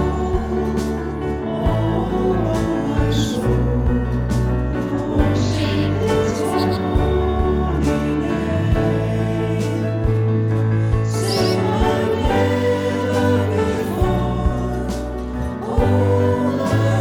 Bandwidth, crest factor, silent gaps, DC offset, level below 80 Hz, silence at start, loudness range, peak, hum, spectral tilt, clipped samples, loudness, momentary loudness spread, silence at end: 15.5 kHz; 16 dB; none; under 0.1%; -26 dBFS; 0 s; 2 LU; -2 dBFS; none; -7 dB/octave; under 0.1%; -19 LUFS; 4 LU; 0 s